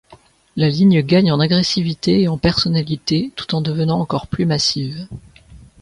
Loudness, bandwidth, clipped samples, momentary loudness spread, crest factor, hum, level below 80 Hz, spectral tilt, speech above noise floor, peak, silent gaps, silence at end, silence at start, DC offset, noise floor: -17 LUFS; 11 kHz; under 0.1%; 11 LU; 16 dB; none; -44 dBFS; -6 dB/octave; 32 dB; 0 dBFS; none; 0.25 s; 0.1 s; under 0.1%; -48 dBFS